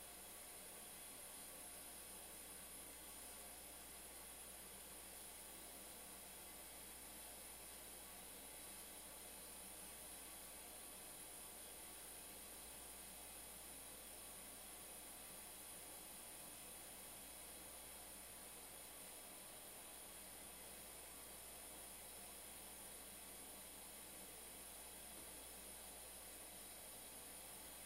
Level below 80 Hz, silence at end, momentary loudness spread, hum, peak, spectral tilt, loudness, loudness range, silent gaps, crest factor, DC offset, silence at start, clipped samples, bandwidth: -72 dBFS; 0 s; 1 LU; none; -42 dBFS; -1 dB/octave; -54 LUFS; 1 LU; none; 14 dB; under 0.1%; 0 s; under 0.1%; 16 kHz